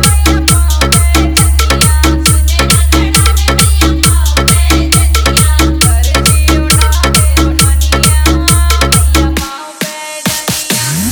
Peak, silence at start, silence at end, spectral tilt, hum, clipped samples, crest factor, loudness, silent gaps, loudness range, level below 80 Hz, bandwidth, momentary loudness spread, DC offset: 0 dBFS; 0 s; 0 s; -3.5 dB/octave; none; 0.5%; 8 dB; -9 LUFS; none; 2 LU; -12 dBFS; over 20 kHz; 5 LU; under 0.1%